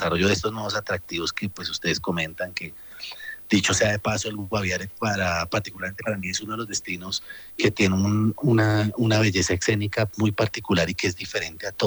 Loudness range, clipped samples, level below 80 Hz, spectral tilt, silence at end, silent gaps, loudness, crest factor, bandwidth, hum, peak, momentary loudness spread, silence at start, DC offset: 5 LU; under 0.1%; -50 dBFS; -4.5 dB/octave; 0 s; none; -24 LUFS; 16 dB; over 20 kHz; none; -8 dBFS; 10 LU; 0 s; under 0.1%